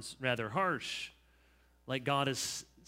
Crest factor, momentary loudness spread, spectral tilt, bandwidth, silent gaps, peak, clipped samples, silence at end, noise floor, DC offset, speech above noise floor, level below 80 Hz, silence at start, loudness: 22 dB; 9 LU; -3.5 dB/octave; 16 kHz; none; -16 dBFS; under 0.1%; 0.25 s; -67 dBFS; under 0.1%; 31 dB; -68 dBFS; 0 s; -35 LUFS